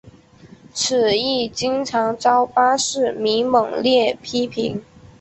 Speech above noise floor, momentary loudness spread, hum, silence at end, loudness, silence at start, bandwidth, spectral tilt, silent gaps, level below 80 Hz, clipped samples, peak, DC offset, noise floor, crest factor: 27 dB; 7 LU; none; 0.15 s; -19 LUFS; 0.05 s; 8.4 kHz; -3 dB/octave; none; -56 dBFS; under 0.1%; -2 dBFS; under 0.1%; -46 dBFS; 16 dB